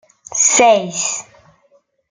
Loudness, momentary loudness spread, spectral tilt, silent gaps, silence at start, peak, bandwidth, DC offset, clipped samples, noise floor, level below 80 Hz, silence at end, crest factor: -13 LUFS; 14 LU; -1 dB/octave; none; 0.3 s; -2 dBFS; 10 kHz; under 0.1%; under 0.1%; -57 dBFS; -60 dBFS; 0.9 s; 16 dB